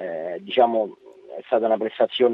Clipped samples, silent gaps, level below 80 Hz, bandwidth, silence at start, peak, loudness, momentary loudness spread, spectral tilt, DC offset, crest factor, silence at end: under 0.1%; none; -78 dBFS; 5.2 kHz; 0 s; -4 dBFS; -23 LUFS; 13 LU; -7 dB/octave; under 0.1%; 18 dB; 0 s